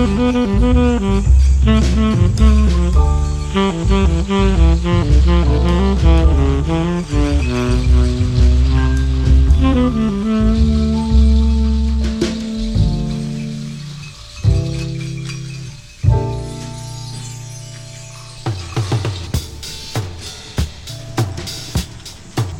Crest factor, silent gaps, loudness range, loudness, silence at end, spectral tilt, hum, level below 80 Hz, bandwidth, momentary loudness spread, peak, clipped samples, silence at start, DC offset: 14 dB; none; 10 LU; -16 LUFS; 0 s; -7 dB/octave; none; -16 dBFS; 11 kHz; 15 LU; 0 dBFS; under 0.1%; 0 s; under 0.1%